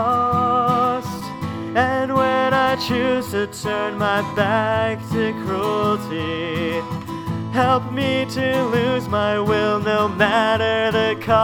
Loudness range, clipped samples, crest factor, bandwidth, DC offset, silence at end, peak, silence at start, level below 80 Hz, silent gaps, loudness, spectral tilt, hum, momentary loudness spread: 3 LU; under 0.1%; 16 dB; 19.5 kHz; under 0.1%; 0 s; -2 dBFS; 0 s; -50 dBFS; none; -20 LUFS; -6 dB/octave; none; 7 LU